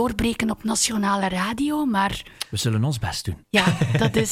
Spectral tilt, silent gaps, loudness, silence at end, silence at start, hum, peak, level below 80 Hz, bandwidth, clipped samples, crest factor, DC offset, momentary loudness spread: -4.5 dB/octave; none; -22 LUFS; 0 s; 0 s; none; -4 dBFS; -42 dBFS; 16.5 kHz; under 0.1%; 18 dB; under 0.1%; 6 LU